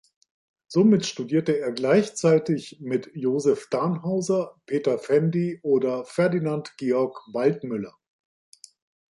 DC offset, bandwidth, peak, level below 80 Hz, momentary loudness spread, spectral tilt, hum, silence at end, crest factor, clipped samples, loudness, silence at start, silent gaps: under 0.1%; 11.5 kHz; -8 dBFS; -70 dBFS; 8 LU; -6.5 dB/octave; none; 1.3 s; 16 dB; under 0.1%; -24 LUFS; 0.7 s; none